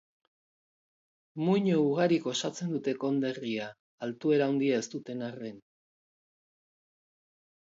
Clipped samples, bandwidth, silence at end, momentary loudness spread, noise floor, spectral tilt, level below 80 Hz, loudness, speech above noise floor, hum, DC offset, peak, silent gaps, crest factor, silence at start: under 0.1%; 7.8 kHz; 2.15 s; 14 LU; under -90 dBFS; -6 dB/octave; -80 dBFS; -30 LUFS; over 61 dB; none; under 0.1%; -12 dBFS; 3.80-3.98 s; 20 dB; 1.35 s